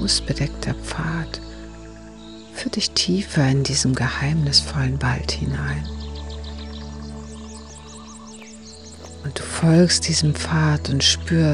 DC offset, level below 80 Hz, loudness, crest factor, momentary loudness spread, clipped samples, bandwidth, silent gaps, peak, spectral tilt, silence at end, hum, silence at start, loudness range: 0.2%; -36 dBFS; -20 LUFS; 20 dB; 22 LU; under 0.1%; 11.5 kHz; none; -2 dBFS; -4 dB/octave; 0 s; none; 0 s; 14 LU